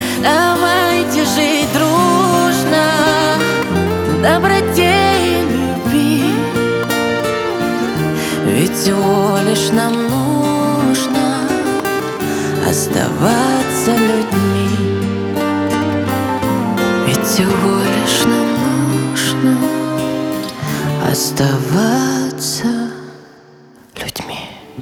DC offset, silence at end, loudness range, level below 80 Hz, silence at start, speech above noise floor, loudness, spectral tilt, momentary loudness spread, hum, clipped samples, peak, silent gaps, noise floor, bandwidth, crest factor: under 0.1%; 0 s; 4 LU; -44 dBFS; 0 s; 29 dB; -14 LUFS; -4.5 dB/octave; 6 LU; none; under 0.1%; 0 dBFS; none; -43 dBFS; 19.5 kHz; 14 dB